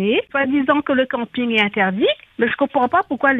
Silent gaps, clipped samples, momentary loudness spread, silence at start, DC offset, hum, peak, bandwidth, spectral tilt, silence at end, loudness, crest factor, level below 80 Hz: none; under 0.1%; 4 LU; 0 s; under 0.1%; none; -2 dBFS; 6.4 kHz; -7 dB/octave; 0 s; -18 LUFS; 16 dB; -58 dBFS